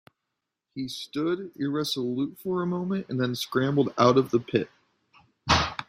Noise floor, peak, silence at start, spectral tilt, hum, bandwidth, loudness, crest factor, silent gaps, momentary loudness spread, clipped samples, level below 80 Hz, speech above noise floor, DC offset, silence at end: -84 dBFS; -6 dBFS; 0.75 s; -5.5 dB/octave; none; 16 kHz; -27 LUFS; 22 dB; none; 13 LU; under 0.1%; -52 dBFS; 58 dB; under 0.1%; 0.05 s